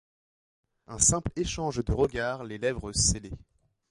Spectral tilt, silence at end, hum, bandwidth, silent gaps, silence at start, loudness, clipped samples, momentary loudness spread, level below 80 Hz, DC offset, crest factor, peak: -3.5 dB/octave; 0.5 s; none; 11.5 kHz; none; 0.9 s; -27 LUFS; under 0.1%; 15 LU; -42 dBFS; under 0.1%; 22 dB; -8 dBFS